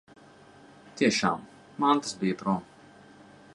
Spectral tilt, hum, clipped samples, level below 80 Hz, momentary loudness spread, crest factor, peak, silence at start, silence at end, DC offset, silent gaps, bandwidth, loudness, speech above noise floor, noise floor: -4.5 dB/octave; none; under 0.1%; -68 dBFS; 13 LU; 22 dB; -8 dBFS; 0.85 s; 0.9 s; under 0.1%; none; 11.5 kHz; -27 LUFS; 27 dB; -53 dBFS